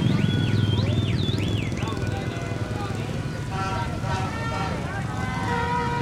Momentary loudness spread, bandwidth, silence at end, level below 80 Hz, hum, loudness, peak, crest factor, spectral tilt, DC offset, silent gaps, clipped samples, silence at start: 7 LU; 13.5 kHz; 0 s; -40 dBFS; none; -26 LUFS; -8 dBFS; 16 dB; -6 dB/octave; under 0.1%; none; under 0.1%; 0 s